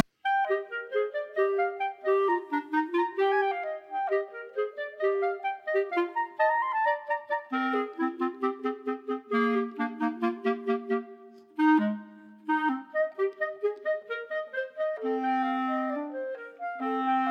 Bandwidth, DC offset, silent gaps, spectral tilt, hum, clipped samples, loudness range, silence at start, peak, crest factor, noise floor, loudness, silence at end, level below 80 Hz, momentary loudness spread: 6.2 kHz; under 0.1%; none; -6.5 dB/octave; none; under 0.1%; 3 LU; 0.25 s; -12 dBFS; 18 dB; -50 dBFS; -29 LUFS; 0 s; -86 dBFS; 8 LU